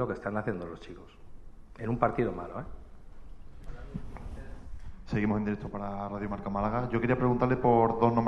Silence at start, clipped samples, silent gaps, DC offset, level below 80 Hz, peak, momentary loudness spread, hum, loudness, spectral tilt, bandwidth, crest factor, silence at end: 0 s; under 0.1%; none; under 0.1%; -46 dBFS; -10 dBFS; 23 LU; none; -30 LUFS; -9.5 dB/octave; 7.4 kHz; 22 dB; 0 s